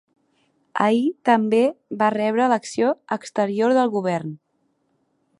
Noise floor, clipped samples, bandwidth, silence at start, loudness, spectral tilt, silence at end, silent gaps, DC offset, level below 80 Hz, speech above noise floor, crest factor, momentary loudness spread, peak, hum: -69 dBFS; under 0.1%; 11 kHz; 0.75 s; -21 LUFS; -6 dB/octave; 1.05 s; none; under 0.1%; -72 dBFS; 49 dB; 20 dB; 8 LU; -2 dBFS; none